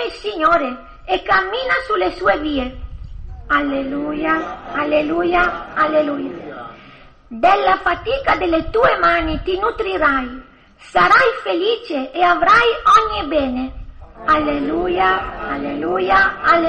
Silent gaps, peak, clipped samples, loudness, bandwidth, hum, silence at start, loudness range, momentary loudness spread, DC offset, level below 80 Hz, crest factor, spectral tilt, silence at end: none; 0 dBFS; under 0.1%; -17 LUFS; 9.4 kHz; none; 0 s; 5 LU; 15 LU; under 0.1%; -36 dBFS; 16 dB; -5 dB/octave; 0 s